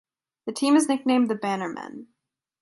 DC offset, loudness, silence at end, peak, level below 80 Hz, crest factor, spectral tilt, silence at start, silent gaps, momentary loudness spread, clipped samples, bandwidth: under 0.1%; -23 LUFS; 0.6 s; -10 dBFS; -76 dBFS; 16 dB; -4 dB/octave; 0.45 s; none; 18 LU; under 0.1%; 11.5 kHz